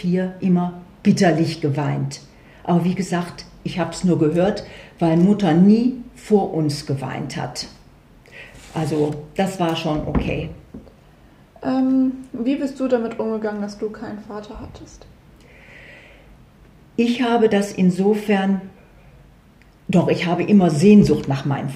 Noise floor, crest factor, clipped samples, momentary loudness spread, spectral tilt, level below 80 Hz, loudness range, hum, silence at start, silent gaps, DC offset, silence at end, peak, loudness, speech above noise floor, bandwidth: -50 dBFS; 18 dB; under 0.1%; 18 LU; -7 dB/octave; -44 dBFS; 8 LU; none; 0 s; none; under 0.1%; 0 s; -2 dBFS; -19 LUFS; 31 dB; 12.5 kHz